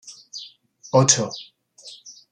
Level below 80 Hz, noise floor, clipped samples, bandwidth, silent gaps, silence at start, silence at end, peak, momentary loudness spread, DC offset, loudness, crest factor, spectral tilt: -66 dBFS; -47 dBFS; under 0.1%; 10.5 kHz; none; 0.05 s; 0.2 s; -2 dBFS; 26 LU; under 0.1%; -19 LUFS; 22 dB; -3.5 dB/octave